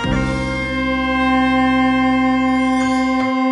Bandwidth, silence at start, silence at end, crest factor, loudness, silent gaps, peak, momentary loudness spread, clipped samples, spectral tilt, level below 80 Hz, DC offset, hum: 10.5 kHz; 0 s; 0 s; 12 dB; -16 LUFS; none; -4 dBFS; 5 LU; under 0.1%; -6 dB/octave; -34 dBFS; under 0.1%; none